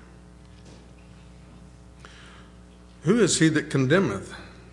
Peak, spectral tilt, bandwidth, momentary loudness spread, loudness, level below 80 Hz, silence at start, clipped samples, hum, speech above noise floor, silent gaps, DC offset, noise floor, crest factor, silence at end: -6 dBFS; -5 dB/octave; 11.5 kHz; 26 LU; -22 LUFS; -52 dBFS; 0.7 s; under 0.1%; none; 27 dB; none; under 0.1%; -48 dBFS; 20 dB; 0.25 s